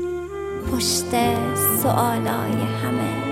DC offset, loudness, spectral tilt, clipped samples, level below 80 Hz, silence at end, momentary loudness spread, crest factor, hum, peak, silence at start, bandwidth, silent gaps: under 0.1%; -21 LUFS; -4.5 dB/octave; under 0.1%; -44 dBFS; 0 s; 9 LU; 16 dB; none; -6 dBFS; 0 s; 16.5 kHz; none